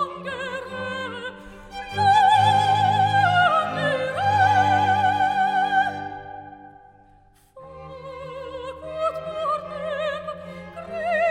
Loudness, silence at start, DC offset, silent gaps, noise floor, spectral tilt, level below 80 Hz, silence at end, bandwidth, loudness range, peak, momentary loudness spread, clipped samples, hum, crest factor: -21 LUFS; 0 s; under 0.1%; none; -55 dBFS; -5 dB/octave; -56 dBFS; 0 s; 11 kHz; 13 LU; -6 dBFS; 20 LU; under 0.1%; none; 16 dB